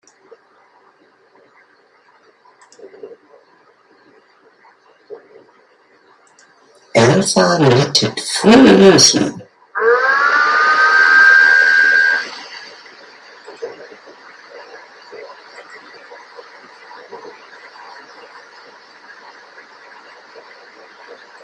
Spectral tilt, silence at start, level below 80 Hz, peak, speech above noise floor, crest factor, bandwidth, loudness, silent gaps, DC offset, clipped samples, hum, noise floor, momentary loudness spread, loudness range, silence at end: -3.5 dB/octave; 3.05 s; -56 dBFS; 0 dBFS; 42 dB; 16 dB; 14 kHz; -10 LUFS; none; under 0.1%; under 0.1%; none; -52 dBFS; 29 LU; 11 LU; 0.3 s